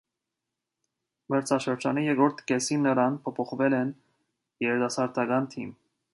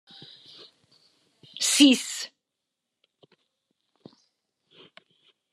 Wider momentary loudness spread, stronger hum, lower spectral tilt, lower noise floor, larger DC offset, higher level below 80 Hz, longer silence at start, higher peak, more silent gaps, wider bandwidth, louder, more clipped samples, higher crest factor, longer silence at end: second, 8 LU vs 29 LU; neither; first, -5 dB/octave vs -1 dB/octave; about the same, -86 dBFS vs -84 dBFS; neither; first, -74 dBFS vs under -90 dBFS; second, 1.3 s vs 1.55 s; second, -10 dBFS vs -4 dBFS; neither; second, 11.5 kHz vs 13 kHz; second, -27 LUFS vs -21 LUFS; neither; second, 20 dB vs 26 dB; second, 0.4 s vs 3.25 s